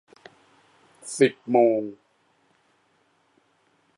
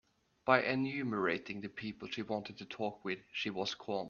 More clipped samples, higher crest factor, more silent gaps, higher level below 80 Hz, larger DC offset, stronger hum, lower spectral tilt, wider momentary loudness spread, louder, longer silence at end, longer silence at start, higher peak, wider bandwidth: neither; about the same, 22 dB vs 26 dB; neither; second, -80 dBFS vs -74 dBFS; neither; neither; about the same, -5 dB/octave vs -5.5 dB/octave; first, 18 LU vs 12 LU; first, -22 LUFS vs -37 LUFS; first, 2.05 s vs 0 s; first, 1.05 s vs 0.45 s; first, -4 dBFS vs -10 dBFS; first, 11.5 kHz vs 7.2 kHz